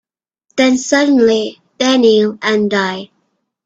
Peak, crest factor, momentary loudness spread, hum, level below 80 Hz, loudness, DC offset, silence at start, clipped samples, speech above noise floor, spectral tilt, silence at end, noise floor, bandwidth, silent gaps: 0 dBFS; 14 dB; 11 LU; none; -56 dBFS; -13 LUFS; under 0.1%; 0.55 s; under 0.1%; 53 dB; -4 dB/octave; 0.6 s; -66 dBFS; 8 kHz; none